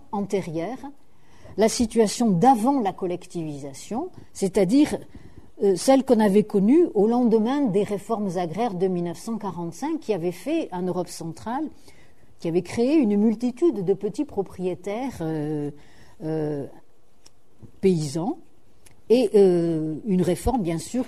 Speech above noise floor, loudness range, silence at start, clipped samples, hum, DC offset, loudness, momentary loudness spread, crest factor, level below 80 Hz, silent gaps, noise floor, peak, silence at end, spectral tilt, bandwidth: 36 dB; 9 LU; 0.15 s; under 0.1%; none; 0.7%; -23 LUFS; 14 LU; 18 dB; -50 dBFS; none; -58 dBFS; -6 dBFS; 0 s; -6.5 dB/octave; 13.5 kHz